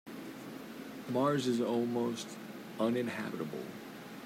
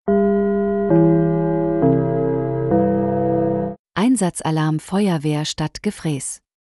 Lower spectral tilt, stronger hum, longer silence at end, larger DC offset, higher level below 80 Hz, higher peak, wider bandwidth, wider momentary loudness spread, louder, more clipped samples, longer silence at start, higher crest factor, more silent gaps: about the same, -5.5 dB/octave vs -6.5 dB/octave; neither; second, 0 s vs 0.4 s; neither; second, -78 dBFS vs -48 dBFS; second, -20 dBFS vs -4 dBFS; first, 16 kHz vs 12 kHz; first, 15 LU vs 8 LU; second, -35 LUFS vs -19 LUFS; neither; about the same, 0.05 s vs 0.05 s; about the same, 16 dB vs 14 dB; second, none vs 3.79-3.85 s